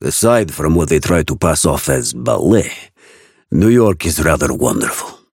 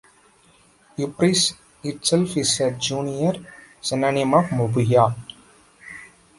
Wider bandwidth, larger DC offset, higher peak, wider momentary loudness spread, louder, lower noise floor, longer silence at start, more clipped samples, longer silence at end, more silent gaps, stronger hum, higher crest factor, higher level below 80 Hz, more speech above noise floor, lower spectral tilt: first, 17 kHz vs 11.5 kHz; neither; about the same, 0 dBFS vs -2 dBFS; second, 7 LU vs 20 LU; first, -14 LUFS vs -21 LUFS; second, -47 dBFS vs -56 dBFS; second, 0 s vs 1 s; neither; second, 0.15 s vs 0.3 s; neither; neither; second, 14 dB vs 20 dB; first, -30 dBFS vs -56 dBFS; about the same, 33 dB vs 35 dB; about the same, -5 dB/octave vs -4.5 dB/octave